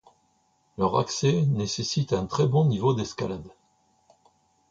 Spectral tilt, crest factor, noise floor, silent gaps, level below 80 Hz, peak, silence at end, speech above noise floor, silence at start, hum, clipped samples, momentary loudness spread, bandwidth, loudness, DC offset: -6 dB/octave; 16 dB; -68 dBFS; none; -54 dBFS; -10 dBFS; 1.2 s; 43 dB; 0.8 s; none; under 0.1%; 10 LU; 7.8 kHz; -25 LUFS; under 0.1%